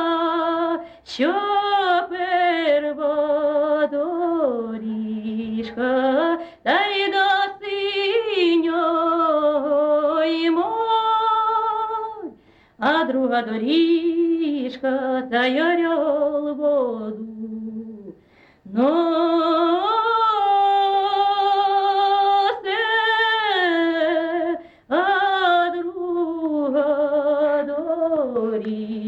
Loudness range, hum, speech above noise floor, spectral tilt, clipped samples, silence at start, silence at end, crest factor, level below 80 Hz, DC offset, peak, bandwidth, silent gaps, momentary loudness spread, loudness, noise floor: 4 LU; none; 33 dB; -5.5 dB/octave; under 0.1%; 0 s; 0 s; 12 dB; -64 dBFS; under 0.1%; -8 dBFS; 7.6 kHz; none; 9 LU; -20 LUFS; -53 dBFS